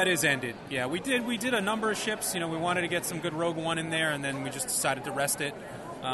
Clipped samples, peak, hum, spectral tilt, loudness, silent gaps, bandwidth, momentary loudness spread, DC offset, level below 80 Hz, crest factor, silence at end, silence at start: under 0.1%; -12 dBFS; none; -3 dB/octave; -29 LUFS; none; 12.5 kHz; 5 LU; under 0.1%; -62 dBFS; 18 dB; 0 s; 0 s